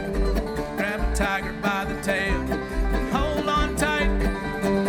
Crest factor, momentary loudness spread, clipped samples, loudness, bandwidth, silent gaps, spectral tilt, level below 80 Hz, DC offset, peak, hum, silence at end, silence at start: 18 dB; 4 LU; under 0.1%; -25 LUFS; 18 kHz; none; -5 dB/octave; -28 dBFS; under 0.1%; -6 dBFS; none; 0 s; 0 s